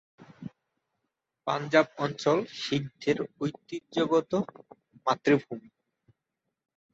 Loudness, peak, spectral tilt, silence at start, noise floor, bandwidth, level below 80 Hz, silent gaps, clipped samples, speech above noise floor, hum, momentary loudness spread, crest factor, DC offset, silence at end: -29 LUFS; -6 dBFS; -5.5 dB/octave; 0.2 s; -85 dBFS; 8 kHz; -70 dBFS; none; under 0.1%; 57 dB; none; 18 LU; 24 dB; under 0.1%; 1.35 s